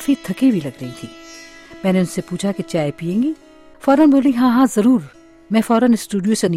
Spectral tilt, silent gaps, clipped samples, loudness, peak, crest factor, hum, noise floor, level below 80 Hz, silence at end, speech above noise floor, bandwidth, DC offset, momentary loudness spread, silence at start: -6 dB/octave; none; under 0.1%; -17 LUFS; -4 dBFS; 14 dB; none; -39 dBFS; -54 dBFS; 0 s; 23 dB; 15 kHz; under 0.1%; 19 LU; 0 s